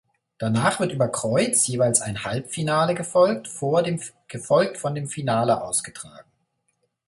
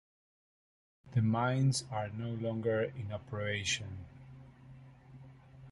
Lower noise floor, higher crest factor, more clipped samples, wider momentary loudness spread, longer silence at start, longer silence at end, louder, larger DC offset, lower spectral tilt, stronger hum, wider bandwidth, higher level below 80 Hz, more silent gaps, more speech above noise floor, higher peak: first, -72 dBFS vs -55 dBFS; about the same, 20 dB vs 18 dB; neither; second, 11 LU vs 25 LU; second, 0.4 s vs 1.05 s; first, 0.85 s vs 0 s; first, -22 LUFS vs -34 LUFS; neither; about the same, -4.5 dB/octave vs -5 dB/octave; neither; about the same, 12 kHz vs 11.5 kHz; about the same, -60 dBFS vs -62 dBFS; neither; first, 50 dB vs 21 dB; first, -4 dBFS vs -18 dBFS